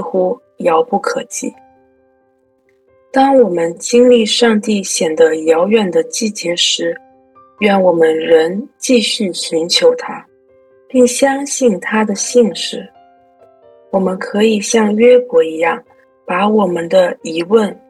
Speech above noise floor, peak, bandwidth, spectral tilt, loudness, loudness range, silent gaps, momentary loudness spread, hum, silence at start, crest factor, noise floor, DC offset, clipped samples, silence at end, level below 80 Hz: 44 dB; 0 dBFS; 12.5 kHz; -3.5 dB/octave; -13 LUFS; 4 LU; none; 10 LU; none; 0 s; 14 dB; -57 dBFS; under 0.1%; under 0.1%; 0.15 s; -62 dBFS